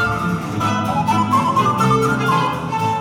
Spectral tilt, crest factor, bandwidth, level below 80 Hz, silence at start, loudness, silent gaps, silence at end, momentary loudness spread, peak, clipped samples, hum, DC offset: -6 dB/octave; 12 dB; 17 kHz; -42 dBFS; 0 s; -17 LUFS; none; 0 s; 5 LU; -4 dBFS; under 0.1%; none; under 0.1%